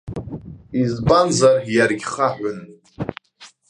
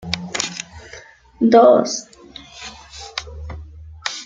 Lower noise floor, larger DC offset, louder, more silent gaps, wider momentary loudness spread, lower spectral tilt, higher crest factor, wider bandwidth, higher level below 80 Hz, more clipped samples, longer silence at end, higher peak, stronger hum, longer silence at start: first, -48 dBFS vs -42 dBFS; neither; about the same, -18 LUFS vs -17 LUFS; neither; second, 19 LU vs 27 LU; about the same, -5 dB/octave vs -4 dB/octave; about the same, 18 dB vs 18 dB; first, 11 kHz vs 9.4 kHz; about the same, -44 dBFS vs -44 dBFS; neither; first, 0.25 s vs 0 s; about the same, -2 dBFS vs -2 dBFS; neither; about the same, 0.05 s vs 0.05 s